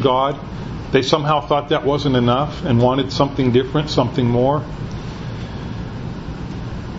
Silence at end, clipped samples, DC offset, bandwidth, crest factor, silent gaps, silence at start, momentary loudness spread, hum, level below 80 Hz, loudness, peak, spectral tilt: 0 s; under 0.1%; under 0.1%; 7.8 kHz; 18 dB; none; 0 s; 13 LU; none; -36 dBFS; -19 LUFS; 0 dBFS; -7 dB/octave